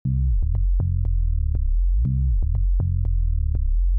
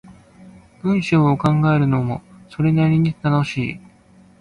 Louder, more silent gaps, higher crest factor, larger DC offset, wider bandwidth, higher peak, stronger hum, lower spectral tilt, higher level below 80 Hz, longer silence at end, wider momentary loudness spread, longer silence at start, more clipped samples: second, -24 LUFS vs -18 LUFS; neither; second, 4 dB vs 14 dB; neither; second, 1.1 kHz vs 9.4 kHz; second, -16 dBFS vs -4 dBFS; neither; first, -15.5 dB/octave vs -8 dB/octave; first, -20 dBFS vs -48 dBFS; second, 0 s vs 0.6 s; second, 2 LU vs 11 LU; about the same, 0.05 s vs 0.1 s; neither